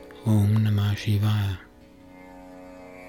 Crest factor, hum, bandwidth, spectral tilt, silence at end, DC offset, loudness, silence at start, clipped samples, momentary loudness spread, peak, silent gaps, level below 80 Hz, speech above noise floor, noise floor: 14 dB; none; 16 kHz; -7 dB/octave; 0 s; under 0.1%; -24 LUFS; 0 s; under 0.1%; 23 LU; -12 dBFS; none; -54 dBFS; 27 dB; -49 dBFS